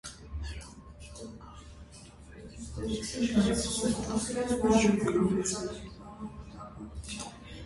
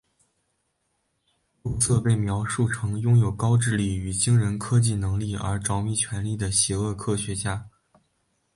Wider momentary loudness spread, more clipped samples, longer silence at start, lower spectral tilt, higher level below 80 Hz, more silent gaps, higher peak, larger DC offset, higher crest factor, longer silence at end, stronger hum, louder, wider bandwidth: first, 23 LU vs 7 LU; neither; second, 0.05 s vs 1.65 s; about the same, -5 dB/octave vs -5 dB/octave; about the same, -46 dBFS vs -44 dBFS; neither; second, -12 dBFS vs -8 dBFS; neither; about the same, 20 dB vs 16 dB; second, 0 s vs 0.9 s; neither; second, -30 LUFS vs -24 LUFS; about the same, 11.5 kHz vs 11.5 kHz